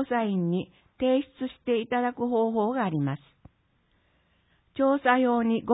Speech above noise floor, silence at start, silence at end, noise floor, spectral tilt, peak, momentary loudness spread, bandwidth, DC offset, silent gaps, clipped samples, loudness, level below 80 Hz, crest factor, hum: 43 dB; 0 s; 0 s; -68 dBFS; -11 dB/octave; -10 dBFS; 12 LU; 4 kHz; under 0.1%; none; under 0.1%; -26 LUFS; -64 dBFS; 18 dB; none